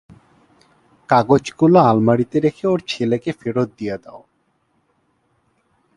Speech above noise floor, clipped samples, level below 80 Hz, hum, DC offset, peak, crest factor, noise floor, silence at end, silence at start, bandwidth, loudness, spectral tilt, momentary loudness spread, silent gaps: 48 dB; under 0.1%; -54 dBFS; none; under 0.1%; 0 dBFS; 20 dB; -65 dBFS; 1.8 s; 1.1 s; 11 kHz; -17 LUFS; -7.5 dB/octave; 11 LU; none